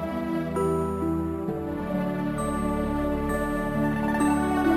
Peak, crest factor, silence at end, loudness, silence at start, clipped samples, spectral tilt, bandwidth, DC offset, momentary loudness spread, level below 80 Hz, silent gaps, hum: -12 dBFS; 14 dB; 0 s; -27 LUFS; 0 s; under 0.1%; -7 dB/octave; 16 kHz; under 0.1%; 6 LU; -40 dBFS; none; none